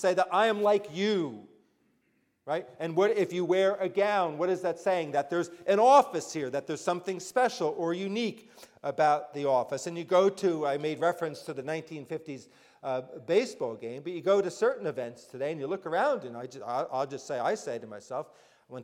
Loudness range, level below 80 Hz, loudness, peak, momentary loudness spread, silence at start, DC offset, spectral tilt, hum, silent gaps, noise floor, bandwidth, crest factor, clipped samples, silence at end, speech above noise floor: 6 LU; -80 dBFS; -29 LUFS; -10 dBFS; 13 LU; 0 s; under 0.1%; -5 dB/octave; none; none; -73 dBFS; 15.5 kHz; 20 dB; under 0.1%; 0 s; 44 dB